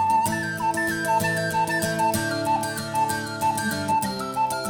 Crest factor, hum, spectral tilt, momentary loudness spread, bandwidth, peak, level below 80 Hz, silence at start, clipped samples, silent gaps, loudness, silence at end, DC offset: 16 dB; none; -4 dB/octave; 3 LU; over 20 kHz; -8 dBFS; -56 dBFS; 0 s; under 0.1%; none; -24 LUFS; 0 s; under 0.1%